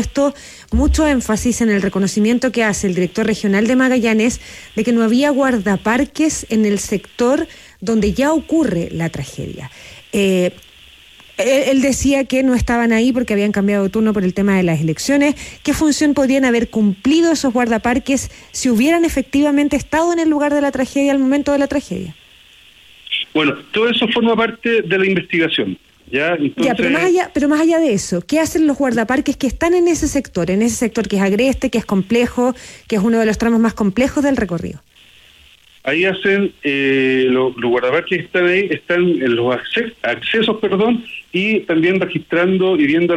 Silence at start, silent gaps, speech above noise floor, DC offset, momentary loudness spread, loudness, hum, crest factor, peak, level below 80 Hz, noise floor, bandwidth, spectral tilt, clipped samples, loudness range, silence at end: 0 s; none; 32 dB; under 0.1%; 7 LU; -16 LUFS; none; 12 dB; -4 dBFS; -36 dBFS; -47 dBFS; 15.5 kHz; -5 dB/octave; under 0.1%; 3 LU; 0 s